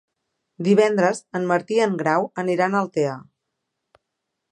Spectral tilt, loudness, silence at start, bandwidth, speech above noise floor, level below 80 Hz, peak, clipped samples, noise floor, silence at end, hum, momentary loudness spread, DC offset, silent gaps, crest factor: -6 dB/octave; -21 LUFS; 0.6 s; 11 kHz; 60 dB; -74 dBFS; -4 dBFS; under 0.1%; -80 dBFS; 1.3 s; none; 9 LU; under 0.1%; none; 18 dB